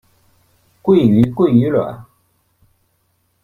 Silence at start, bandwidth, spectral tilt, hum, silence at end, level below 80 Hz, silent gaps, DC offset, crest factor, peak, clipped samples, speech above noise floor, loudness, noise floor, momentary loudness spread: 0.85 s; 4.2 kHz; -10 dB/octave; none; 1.4 s; -48 dBFS; none; under 0.1%; 16 dB; -2 dBFS; under 0.1%; 51 dB; -14 LUFS; -63 dBFS; 14 LU